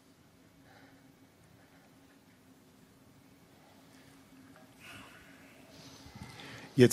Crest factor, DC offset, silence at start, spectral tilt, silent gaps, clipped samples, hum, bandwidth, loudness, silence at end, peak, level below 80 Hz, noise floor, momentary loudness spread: 30 dB; under 0.1%; 6.75 s; -6.5 dB/octave; none; under 0.1%; none; 15 kHz; -38 LUFS; 0 s; -8 dBFS; -72 dBFS; -62 dBFS; 13 LU